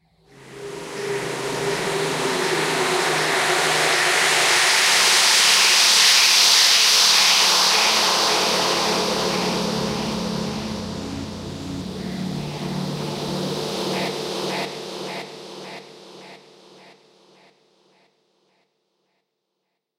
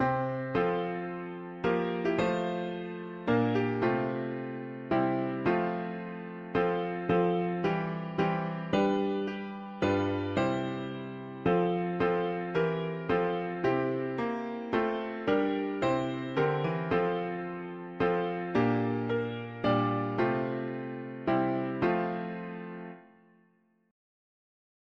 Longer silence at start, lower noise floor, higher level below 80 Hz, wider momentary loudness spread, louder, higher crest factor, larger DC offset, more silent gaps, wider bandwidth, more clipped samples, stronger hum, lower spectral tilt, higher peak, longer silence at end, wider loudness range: first, 0.4 s vs 0 s; first, -78 dBFS vs -68 dBFS; first, -54 dBFS vs -60 dBFS; first, 19 LU vs 10 LU; first, -17 LUFS vs -31 LUFS; about the same, 20 dB vs 16 dB; neither; neither; first, 16 kHz vs 7.4 kHz; neither; neither; second, -1 dB/octave vs -8 dB/octave; first, -2 dBFS vs -14 dBFS; first, 3.6 s vs 1.9 s; first, 16 LU vs 2 LU